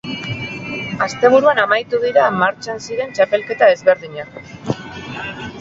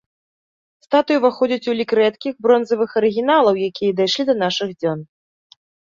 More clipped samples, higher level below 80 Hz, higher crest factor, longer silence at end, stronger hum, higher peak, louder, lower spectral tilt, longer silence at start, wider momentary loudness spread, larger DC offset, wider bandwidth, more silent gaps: neither; first, -52 dBFS vs -64 dBFS; about the same, 16 dB vs 16 dB; second, 0 s vs 0.9 s; neither; about the same, 0 dBFS vs -2 dBFS; about the same, -17 LUFS vs -18 LUFS; about the same, -5 dB/octave vs -5 dB/octave; second, 0.05 s vs 0.9 s; first, 15 LU vs 6 LU; neither; about the same, 7.8 kHz vs 7.4 kHz; neither